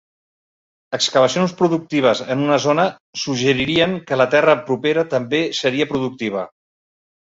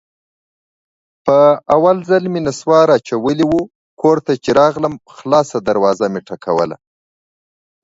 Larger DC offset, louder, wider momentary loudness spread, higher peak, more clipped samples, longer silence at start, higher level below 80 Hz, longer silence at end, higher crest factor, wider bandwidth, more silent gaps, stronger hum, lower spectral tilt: neither; second, -18 LUFS vs -14 LUFS; about the same, 8 LU vs 10 LU; about the same, -2 dBFS vs 0 dBFS; neither; second, 0.9 s vs 1.25 s; about the same, -56 dBFS vs -52 dBFS; second, 0.75 s vs 1.1 s; about the same, 16 dB vs 16 dB; about the same, 8 kHz vs 8 kHz; second, 3.00-3.13 s vs 3.75-3.97 s; neither; second, -4.5 dB/octave vs -6 dB/octave